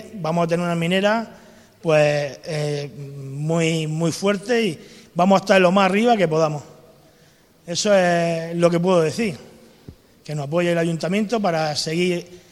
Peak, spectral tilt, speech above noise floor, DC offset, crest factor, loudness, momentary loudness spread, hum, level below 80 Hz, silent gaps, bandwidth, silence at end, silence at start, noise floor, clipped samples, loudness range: -2 dBFS; -5.5 dB/octave; 34 dB; under 0.1%; 20 dB; -20 LUFS; 12 LU; none; -60 dBFS; none; 13 kHz; 0.15 s; 0 s; -54 dBFS; under 0.1%; 4 LU